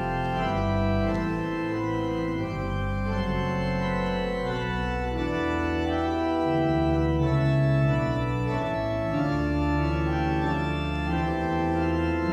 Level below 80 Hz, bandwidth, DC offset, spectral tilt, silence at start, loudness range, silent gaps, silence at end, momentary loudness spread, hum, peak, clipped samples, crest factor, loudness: -36 dBFS; 8.8 kHz; under 0.1%; -8 dB/octave; 0 s; 3 LU; none; 0 s; 5 LU; none; -12 dBFS; under 0.1%; 14 dB; -26 LUFS